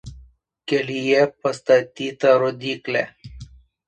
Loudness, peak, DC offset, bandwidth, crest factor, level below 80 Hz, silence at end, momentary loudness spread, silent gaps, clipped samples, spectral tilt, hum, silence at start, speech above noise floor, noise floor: -20 LUFS; -4 dBFS; under 0.1%; 9.4 kHz; 18 dB; -50 dBFS; 0.45 s; 15 LU; none; under 0.1%; -5 dB/octave; none; 0.05 s; 30 dB; -50 dBFS